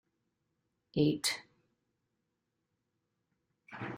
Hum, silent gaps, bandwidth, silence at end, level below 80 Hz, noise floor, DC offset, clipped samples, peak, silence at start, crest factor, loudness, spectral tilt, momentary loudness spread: none; none; 13.5 kHz; 0 s; -74 dBFS; -84 dBFS; under 0.1%; under 0.1%; -18 dBFS; 0.95 s; 24 dB; -33 LUFS; -4.5 dB/octave; 16 LU